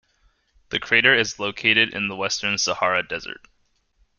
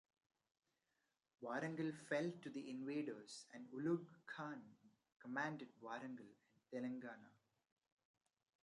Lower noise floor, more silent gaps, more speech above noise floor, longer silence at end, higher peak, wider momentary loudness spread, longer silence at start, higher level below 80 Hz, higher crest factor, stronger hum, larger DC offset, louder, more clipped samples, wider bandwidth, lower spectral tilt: second, -65 dBFS vs -89 dBFS; second, none vs 5.12-5.20 s; about the same, 43 dB vs 41 dB; second, 0.85 s vs 1.3 s; first, -2 dBFS vs -30 dBFS; about the same, 14 LU vs 13 LU; second, 0.7 s vs 1.4 s; first, -58 dBFS vs under -90 dBFS; about the same, 22 dB vs 20 dB; neither; neither; first, -20 LUFS vs -48 LUFS; neither; about the same, 11 kHz vs 11 kHz; second, -2 dB/octave vs -6 dB/octave